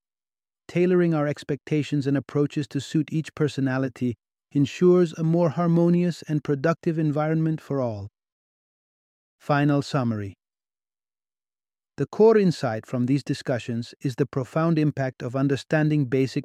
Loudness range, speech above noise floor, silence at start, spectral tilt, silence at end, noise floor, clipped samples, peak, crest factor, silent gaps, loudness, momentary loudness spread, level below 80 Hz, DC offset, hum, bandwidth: 6 LU; over 67 dB; 0.7 s; -7.5 dB/octave; 0 s; under -90 dBFS; under 0.1%; -6 dBFS; 18 dB; 8.32-9.39 s; -24 LUFS; 10 LU; -66 dBFS; under 0.1%; none; 10.5 kHz